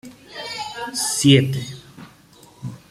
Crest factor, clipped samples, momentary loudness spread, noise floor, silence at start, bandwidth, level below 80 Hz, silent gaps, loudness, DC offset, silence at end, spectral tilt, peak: 20 dB; under 0.1%; 22 LU; -49 dBFS; 0.05 s; 15.5 kHz; -56 dBFS; none; -19 LUFS; under 0.1%; 0.15 s; -4.5 dB/octave; -2 dBFS